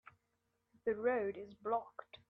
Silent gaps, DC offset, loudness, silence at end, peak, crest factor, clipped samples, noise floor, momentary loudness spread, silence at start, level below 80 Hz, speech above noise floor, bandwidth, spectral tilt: none; under 0.1%; -39 LUFS; 0.15 s; -22 dBFS; 18 dB; under 0.1%; -83 dBFS; 10 LU; 0.85 s; -80 dBFS; 44 dB; 5 kHz; -7.5 dB/octave